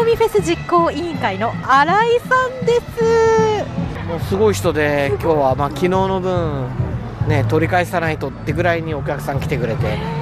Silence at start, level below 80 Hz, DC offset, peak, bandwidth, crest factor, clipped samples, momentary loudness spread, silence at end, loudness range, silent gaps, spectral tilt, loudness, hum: 0 s; -36 dBFS; under 0.1%; -4 dBFS; 14.5 kHz; 14 dB; under 0.1%; 8 LU; 0 s; 3 LU; none; -6 dB/octave; -17 LUFS; none